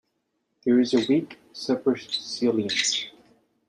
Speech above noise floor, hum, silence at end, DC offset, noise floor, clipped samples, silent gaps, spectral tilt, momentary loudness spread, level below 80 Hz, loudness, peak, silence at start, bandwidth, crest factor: 51 dB; none; 0.6 s; under 0.1%; -76 dBFS; under 0.1%; none; -3.5 dB/octave; 11 LU; -70 dBFS; -24 LUFS; -8 dBFS; 0.65 s; 10.5 kHz; 18 dB